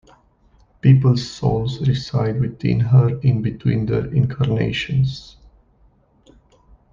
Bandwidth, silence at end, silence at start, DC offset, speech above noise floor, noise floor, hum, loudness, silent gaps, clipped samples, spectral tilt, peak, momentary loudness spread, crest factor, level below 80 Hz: 7.2 kHz; 1.7 s; 0.85 s; under 0.1%; 38 dB; -56 dBFS; none; -19 LUFS; none; under 0.1%; -8 dB/octave; -2 dBFS; 7 LU; 16 dB; -44 dBFS